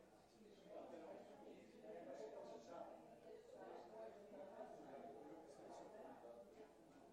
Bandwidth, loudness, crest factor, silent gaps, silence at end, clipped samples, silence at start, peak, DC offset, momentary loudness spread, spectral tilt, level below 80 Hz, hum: 12 kHz; -60 LUFS; 16 dB; none; 0 s; under 0.1%; 0 s; -42 dBFS; under 0.1%; 8 LU; -5.5 dB/octave; -88 dBFS; none